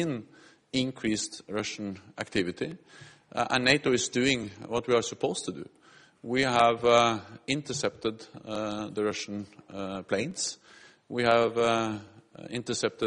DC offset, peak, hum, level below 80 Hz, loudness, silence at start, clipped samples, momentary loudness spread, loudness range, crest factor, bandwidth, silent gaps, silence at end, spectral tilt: under 0.1%; -6 dBFS; none; -62 dBFS; -29 LUFS; 0 s; under 0.1%; 16 LU; 6 LU; 24 dB; 11 kHz; none; 0 s; -3.5 dB/octave